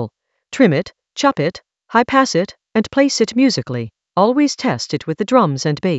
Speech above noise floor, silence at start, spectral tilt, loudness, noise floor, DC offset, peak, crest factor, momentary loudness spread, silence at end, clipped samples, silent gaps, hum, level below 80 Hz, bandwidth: 20 dB; 0 s; -5 dB/octave; -17 LUFS; -36 dBFS; under 0.1%; 0 dBFS; 16 dB; 9 LU; 0 s; under 0.1%; none; none; -56 dBFS; 8.2 kHz